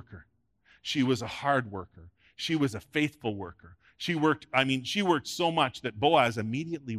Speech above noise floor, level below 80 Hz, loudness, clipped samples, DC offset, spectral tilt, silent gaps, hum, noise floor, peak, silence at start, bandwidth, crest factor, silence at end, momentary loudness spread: 37 dB; -66 dBFS; -28 LUFS; under 0.1%; under 0.1%; -5 dB/octave; none; none; -66 dBFS; -8 dBFS; 0.1 s; 14 kHz; 22 dB; 0 s; 13 LU